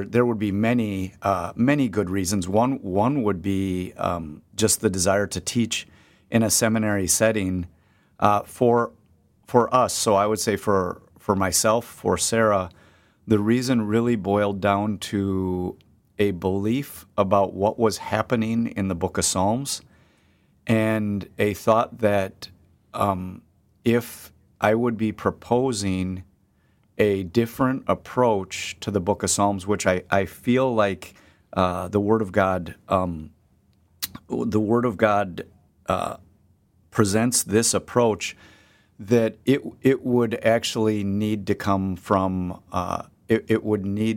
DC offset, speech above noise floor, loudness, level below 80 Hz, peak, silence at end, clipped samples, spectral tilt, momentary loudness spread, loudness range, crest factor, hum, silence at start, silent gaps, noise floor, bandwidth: under 0.1%; 40 dB; -23 LUFS; -54 dBFS; -2 dBFS; 0 s; under 0.1%; -5 dB/octave; 10 LU; 3 LU; 20 dB; none; 0 s; none; -62 dBFS; 17 kHz